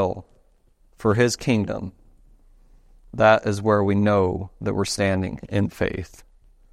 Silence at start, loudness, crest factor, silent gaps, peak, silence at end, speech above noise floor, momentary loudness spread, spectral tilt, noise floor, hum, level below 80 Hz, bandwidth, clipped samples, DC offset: 0 s; -22 LUFS; 20 dB; none; -4 dBFS; 0.5 s; 37 dB; 15 LU; -6 dB/octave; -58 dBFS; none; -48 dBFS; 13.5 kHz; under 0.1%; under 0.1%